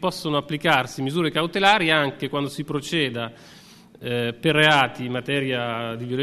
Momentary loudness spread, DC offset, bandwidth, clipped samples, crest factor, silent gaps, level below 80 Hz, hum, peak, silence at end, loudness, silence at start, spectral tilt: 12 LU; under 0.1%; 14 kHz; under 0.1%; 20 dB; none; -58 dBFS; none; -4 dBFS; 0 s; -22 LUFS; 0 s; -5 dB/octave